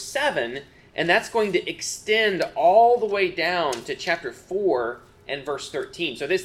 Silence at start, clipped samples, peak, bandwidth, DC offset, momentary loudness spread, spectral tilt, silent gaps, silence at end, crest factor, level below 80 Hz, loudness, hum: 0 s; under 0.1%; -6 dBFS; 15 kHz; under 0.1%; 13 LU; -3 dB/octave; none; 0 s; 18 dB; -60 dBFS; -23 LUFS; none